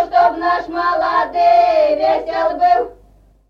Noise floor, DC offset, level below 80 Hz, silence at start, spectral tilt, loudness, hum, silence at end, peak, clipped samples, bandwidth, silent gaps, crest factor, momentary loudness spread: -49 dBFS; under 0.1%; -48 dBFS; 0 s; -5 dB/octave; -15 LUFS; none; 0.6 s; -2 dBFS; under 0.1%; 6.6 kHz; none; 14 dB; 6 LU